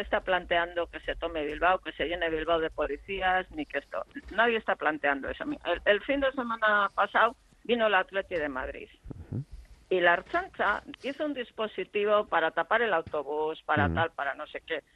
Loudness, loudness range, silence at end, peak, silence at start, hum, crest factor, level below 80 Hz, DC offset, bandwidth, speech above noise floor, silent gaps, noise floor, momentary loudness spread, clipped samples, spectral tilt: -29 LUFS; 3 LU; 0.15 s; -10 dBFS; 0 s; none; 20 dB; -52 dBFS; under 0.1%; 11.5 kHz; 19 dB; none; -48 dBFS; 11 LU; under 0.1%; -6.5 dB/octave